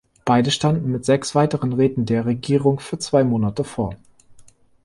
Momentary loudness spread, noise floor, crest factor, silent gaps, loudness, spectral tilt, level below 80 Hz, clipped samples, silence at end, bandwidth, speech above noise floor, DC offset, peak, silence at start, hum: 7 LU; -49 dBFS; 16 dB; none; -20 LUFS; -6 dB/octave; -50 dBFS; under 0.1%; 0.45 s; 11.5 kHz; 30 dB; under 0.1%; -4 dBFS; 0.25 s; none